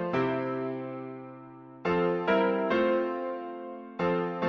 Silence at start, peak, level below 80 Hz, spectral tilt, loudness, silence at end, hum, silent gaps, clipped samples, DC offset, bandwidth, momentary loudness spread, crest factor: 0 s; -14 dBFS; -64 dBFS; -8 dB/octave; -29 LUFS; 0 s; none; none; under 0.1%; under 0.1%; 6.6 kHz; 16 LU; 16 dB